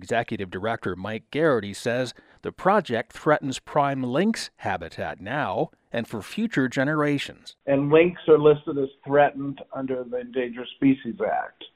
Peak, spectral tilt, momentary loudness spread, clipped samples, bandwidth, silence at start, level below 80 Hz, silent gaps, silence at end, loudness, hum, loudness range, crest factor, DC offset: -4 dBFS; -6 dB/octave; 13 LU; under 0.1%; 13.5 kHz; 0 s; -60 dBFS; none; 0.1 s; -25 LUFS; none; 5 LU; 20 dB; under 0.1%